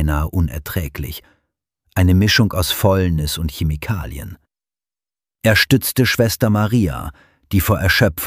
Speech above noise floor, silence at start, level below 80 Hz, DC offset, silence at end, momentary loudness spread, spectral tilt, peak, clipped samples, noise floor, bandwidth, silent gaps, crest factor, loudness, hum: over 73 dB; 0 s; -30 dBFS; under 0.1%; 0 s; 15 LU; -5 dB/octave; -2 dBFS; under 0.1%; under -90 dBFS; 16 kHz; none; 16 dB; -17 LUFS; none